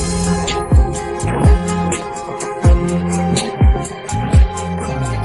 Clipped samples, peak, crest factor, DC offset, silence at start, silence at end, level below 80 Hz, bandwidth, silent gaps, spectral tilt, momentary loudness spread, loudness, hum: under 0.1%; -2 dBFS; 14 dB; under 0.1%; 0 s; 0 s; -18 dBFS; 11.5 kHz; none; -6 dB/octave; 8 LU; -17 LUFS; none